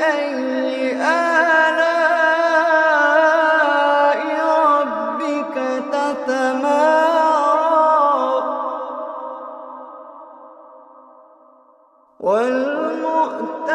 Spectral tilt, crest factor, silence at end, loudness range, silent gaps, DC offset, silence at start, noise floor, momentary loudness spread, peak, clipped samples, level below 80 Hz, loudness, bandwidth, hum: -3 dB/octave; 16 dB; 0 s; 13 LU; none; under 0.1%; 0 s; -53 dBFS; 13 LU; -2 dBFS; under 0.1%; -76 dBFS; -17 LUFS; 11.5 kHz; none